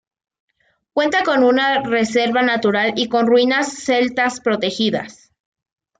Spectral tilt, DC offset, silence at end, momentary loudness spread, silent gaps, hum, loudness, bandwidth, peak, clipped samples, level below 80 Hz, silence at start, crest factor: -4 dB/octave; under 0.1%; 0.9 s; 6 LU; none; none; -17 LUFS; 9.4 kHz; -4 dBFS; under 0.1%; -60 dBFS; 0.95 s; 14 dB